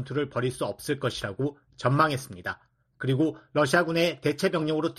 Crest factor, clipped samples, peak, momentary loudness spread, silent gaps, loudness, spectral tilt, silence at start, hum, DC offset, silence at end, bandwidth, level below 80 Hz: 20 dB; under 0.1%; -8 dBFS; 10 LU; none; -27 LUFS; -5.5 dB/octave; 0 s; none; under 0.1%; 0.05 s; 13.5 kHz; -60 dBFS